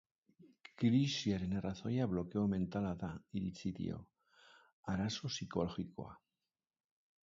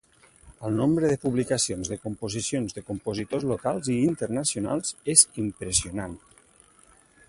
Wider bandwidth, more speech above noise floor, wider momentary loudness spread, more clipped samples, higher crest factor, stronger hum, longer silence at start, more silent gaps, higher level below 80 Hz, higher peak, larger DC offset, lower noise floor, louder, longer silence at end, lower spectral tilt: second, 7.6 kHz vs 11.5 kHz; first, over 52 dB vs 31 dB; about the same, 14 LU vs 14 LU; neither; second, 18 dB vs 26 dB; neither; about the same, 0.45 s vs 0.45 s; first, 4.73-4.83 s vs none; second, -62 dBFS vs -52 dBFS; second, -22 dBFS vs -2 dBFS; neither; first, under -90 dBFS vs -58 dBFS; second, -39 LUFS vs -25 LUFS; about the same, 1.05 s vs 1.1 s; first, -6 dB/octave vs -4 dB/octave